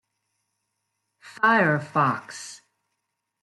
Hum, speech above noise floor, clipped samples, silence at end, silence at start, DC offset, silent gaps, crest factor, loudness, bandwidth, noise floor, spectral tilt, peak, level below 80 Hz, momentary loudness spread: none; 57 dB; under 0.1%; 0.85 s; 1.25 s; under 0.1%; none; 20 dB; -22 LUFS; 12 kHz; -80 dBFS; -5.5 dB/octave; -6 dBFS; -72 dBFS; 19 LU